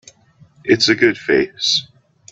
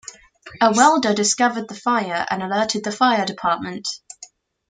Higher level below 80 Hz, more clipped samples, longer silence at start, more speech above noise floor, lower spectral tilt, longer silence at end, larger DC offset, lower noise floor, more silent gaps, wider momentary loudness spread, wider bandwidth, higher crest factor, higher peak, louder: first, -56 dBFS vs -64 dBFS; neither; first, 0.65 s vs 0.1 s; first, 35 dB vs 27 dB; about the same, -3 dB/octave vs -3 dB/octave; about the same, 0.5 s vs 0.45 s; neither; first, -50 dBFS vs -46 dBFS; neither; second, 6 LU vs 15 LU; second, 8.2 kHz vs 9.6 kHz; about the same, 18 dB vs 18 dB; about the same, 0 dBFS vs -2 dBFS; first, -15 LUFS vs -19 LUFS